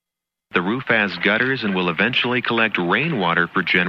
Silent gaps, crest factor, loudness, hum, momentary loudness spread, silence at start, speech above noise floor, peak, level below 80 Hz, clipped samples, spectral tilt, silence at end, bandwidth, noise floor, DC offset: none; 18 dB; -19 LUFS; none; 4 LU; 0.55 s; 66 dB; -2 dBFS; -60 dBFS; under 0.1%; -7 dB/octave; 0 s; 6.6 kHz; -85 dBFS; under 0.1%